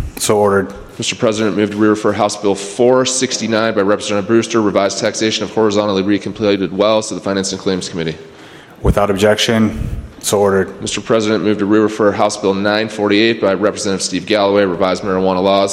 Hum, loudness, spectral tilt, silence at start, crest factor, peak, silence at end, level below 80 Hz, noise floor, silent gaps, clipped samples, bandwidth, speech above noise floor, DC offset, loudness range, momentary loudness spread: none; -15 LUFS; -4.5 dB/octave; 0 s; 14 dB; 0 dBFS; 0 s; -36 dBFS; -37 dBFS; none; under 0.1%; 16 kHz; 23 dB; under 0.1%; 2 LU; 7 LU